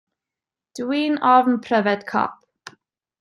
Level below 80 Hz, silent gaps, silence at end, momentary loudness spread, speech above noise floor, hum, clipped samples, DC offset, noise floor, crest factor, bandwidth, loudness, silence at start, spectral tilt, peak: -72 dBFS; none; 0.85 s; 12 LU; 69 dB; none; under 0.1%; under 0.1%; -88 dBFS; 20 dB; 12 kHz; -20 LUFS; 0.75 s; -5.5 dB/octave; -2 dBFS